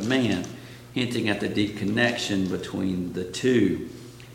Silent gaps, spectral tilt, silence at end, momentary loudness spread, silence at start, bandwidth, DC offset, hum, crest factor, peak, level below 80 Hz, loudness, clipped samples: none; -5 dB/octave; 0 s; 11 LU; 0 s; 17 kHz; under 0.1%; none; 20 dB; -6 dBFS; -56 dBFS; -26 LUFS; under 0.1%